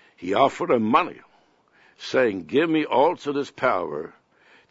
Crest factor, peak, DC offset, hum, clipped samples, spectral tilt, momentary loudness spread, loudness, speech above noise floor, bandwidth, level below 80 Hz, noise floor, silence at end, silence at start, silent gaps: 20 dB; -4 dBFS; under 0.1%; none; under 0.1%; -5.5 dB/octave; 12 LU; -22 LUFS; 38 dB; 8 kHz; -66 dBFS; -60 dBFS; 0.6 s; 0.2 s; none